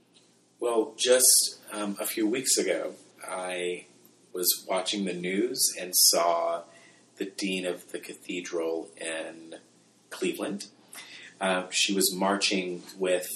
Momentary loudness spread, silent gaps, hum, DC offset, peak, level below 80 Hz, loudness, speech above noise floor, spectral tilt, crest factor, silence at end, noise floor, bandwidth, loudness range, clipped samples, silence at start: 20 LU; none; none; under 0.1%; -6 dBFS; -88 dBFS; -26 LUFS; 34 dB; -1.5 dB/octave; 22 dB; 0 s; -62 dBFS; 15 kHz; 10 LU; under 0.1%; 0.6 s